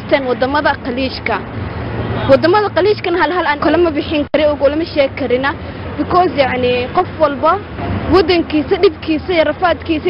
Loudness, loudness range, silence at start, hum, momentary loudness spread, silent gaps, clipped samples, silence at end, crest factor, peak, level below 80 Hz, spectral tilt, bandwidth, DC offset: -14 LUFS; 2 LU; 0 s; none; 8 LU; none; under 0.1%; 0 s; 14 dB; 0 dBFS; -34 dBFS; -8.5 dB/octave; 5.8 kHz; under 0.1%